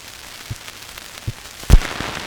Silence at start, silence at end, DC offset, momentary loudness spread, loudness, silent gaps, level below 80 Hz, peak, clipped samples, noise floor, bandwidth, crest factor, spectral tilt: 0.05 s; 0 s; under 0.1%; 16 LU; -23 LUFS; none; -20 dBFS; 0 dBFS; under 0.1%; -37 dBFS; over 20 kHz; 20 dB; -4.5 dB/octave